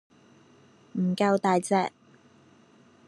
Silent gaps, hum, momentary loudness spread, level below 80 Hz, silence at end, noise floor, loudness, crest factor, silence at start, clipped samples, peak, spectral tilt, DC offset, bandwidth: none; none; 10 LU; -78 dBFS; 1.2 s; -58 dBFS; -26 LUFS; 20 dB; 0.95 s; under 0.1%; -10 dBFS; -6 dB/octave; under 0.1%; 12 kHz